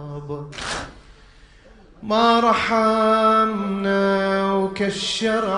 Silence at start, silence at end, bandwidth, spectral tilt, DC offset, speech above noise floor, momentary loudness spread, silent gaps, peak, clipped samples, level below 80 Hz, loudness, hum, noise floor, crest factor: 0 s; 0 s; 10.5 kHz; -4.5 dB/octave; under 0.1%; 29 dB; 15 LU; none; -4 dBFS; under 0.1%; -48 dBFS; -19 LUFS; none; -48 dBFS; 16 dB